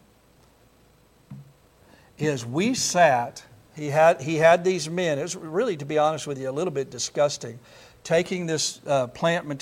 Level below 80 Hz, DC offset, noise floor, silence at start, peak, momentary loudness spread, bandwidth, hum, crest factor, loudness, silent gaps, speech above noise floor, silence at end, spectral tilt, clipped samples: -64 dBFS; under 0.1%; -58 dBFS; 1.3 s; -4 dBFS; 11 LU; 15.5 kHz; none; 20 dB; -24 LUFS; none; 34 dB; 0 s; -4 dB/octave; under 0.1%